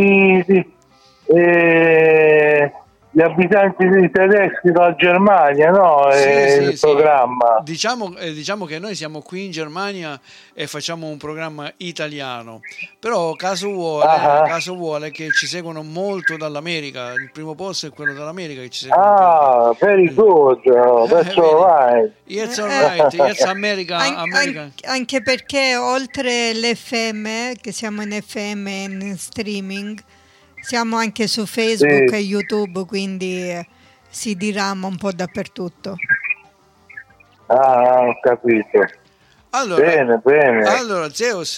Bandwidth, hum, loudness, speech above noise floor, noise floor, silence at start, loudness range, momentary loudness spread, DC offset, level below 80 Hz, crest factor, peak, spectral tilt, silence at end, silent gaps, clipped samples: 15 kHz; none; -16 LUFS; 37 dB; -53 dBFS; 0 s; 12 LU; 16 LU; under 0.1%; -62 dBFS; 14 dB; -2 dBFS; -4.5 dB/octave; 0 s; none; under 0.1%